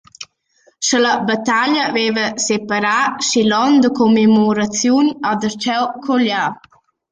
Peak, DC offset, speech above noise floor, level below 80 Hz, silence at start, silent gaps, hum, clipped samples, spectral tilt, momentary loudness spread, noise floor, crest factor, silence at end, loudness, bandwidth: -4 dBFS; under 0.1%; 42 dB; -58 dBFS; 0.2 s; none; none; under 0.1%; -3.5 dB/octave; 7 LU; -57 dBFS; 12 dB; 0.55 s; -15 LUFS; 9.4 kHz